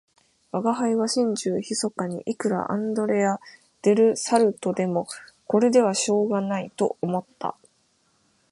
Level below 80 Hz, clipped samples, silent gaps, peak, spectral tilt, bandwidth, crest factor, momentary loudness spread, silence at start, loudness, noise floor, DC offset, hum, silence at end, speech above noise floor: -72 dBFS; under 0.1%; none; -6 dBFS; -5 dB/octave; 11.5 kHz; 18 dB; 10 LU; 0.55 s; -24 LUFS; -66 dBFS; under 0.1%; none; 1 s; 43 dB